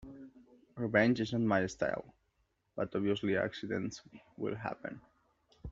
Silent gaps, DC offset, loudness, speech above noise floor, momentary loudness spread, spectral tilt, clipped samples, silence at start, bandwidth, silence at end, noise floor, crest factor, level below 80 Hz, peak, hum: none; under 0.1%; -34 LUFS; 44 dB; 22 LU; -5 dB/octave; under 0.1%; 0 s; 7.8 kHz; 0 s; -78 dBFS; 22 dB; -66 dBFS; -14 dBFS; none